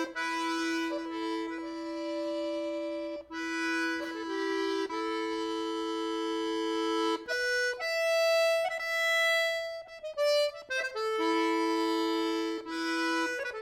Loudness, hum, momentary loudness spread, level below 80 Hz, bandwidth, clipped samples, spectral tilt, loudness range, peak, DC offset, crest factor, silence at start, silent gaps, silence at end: -31 LUFS; none; 9 LU; -70 dBFS; 17.5 kHz; under 0.1%; -1.5 dB/octave; 6 LU; -18 dBFS; under 0.1%; 12 dB; 0 s; none; 0 s